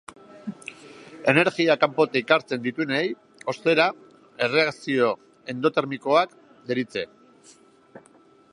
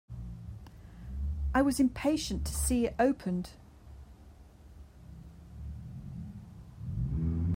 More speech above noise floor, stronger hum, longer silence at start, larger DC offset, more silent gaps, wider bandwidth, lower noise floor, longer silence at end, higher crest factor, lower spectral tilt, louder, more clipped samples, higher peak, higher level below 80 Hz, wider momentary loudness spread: first, 33 dB vs 24 dB; neither; first, 0.35 s vs 0.1 s; neither; neither; second, 11 kHz vs 16 kHz; about the same, -55 dBFS vs -54 dBFS; first, 0.55 s vs 0 s; about the same, 22 dB vs 20 dB; about the same, -5.5 dB/octave vs -5.5 dB/octave; first, -23 LUFS vs -32 LUFS; neither; first, -2 dBFS vs -14 dBFS; second, -72 dBFS vs -42 dBFS; second, 18 LU vs 24 LU